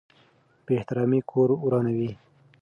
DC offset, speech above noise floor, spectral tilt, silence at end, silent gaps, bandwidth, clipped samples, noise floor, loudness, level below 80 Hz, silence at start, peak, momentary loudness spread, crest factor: under 0.1%; 37 dB; -10.5 dB/octave; 0.5 s; none; 5.2 kHz; under 0.1%; -61 dBFS; -25 LUFS; -64 dBFS; 0.7 s; -10 dBFS; 6 LU; 16 dB